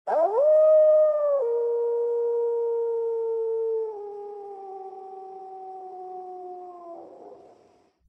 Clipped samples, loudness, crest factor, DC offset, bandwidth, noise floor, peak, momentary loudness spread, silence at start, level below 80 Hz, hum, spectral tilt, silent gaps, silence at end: under 0.1%; -23 LUFS; 14 dB; under 0.1%; 2.6 kHz; -60 dBFS; -12 dBFS; 23 LU; 0.05 s; -84 dBFS; none; -6 dB/octave; none; 0.75 s